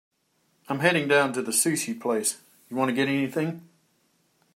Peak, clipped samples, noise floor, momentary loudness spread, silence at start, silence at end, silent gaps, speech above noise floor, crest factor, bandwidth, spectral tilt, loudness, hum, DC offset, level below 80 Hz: -4 dBFS; under 0.1%; -70 dBFS; 12 LU; 0.7 s; 0.9 s; none; 45 dB; 22 dB; 16 kHz; -3.5 dB/octave; -25 LUFS; none; under 0.1%; -76 dBFS